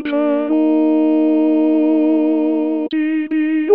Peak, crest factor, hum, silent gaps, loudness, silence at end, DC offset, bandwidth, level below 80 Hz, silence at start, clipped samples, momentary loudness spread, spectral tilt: -2 dBFS; 14 dB; none; none; -16 LUFS; 0 s; 0.4%; 4.3 kHz; -66 dBFS; 0 s; under 0.1%; 4 LU; -9 dB/octave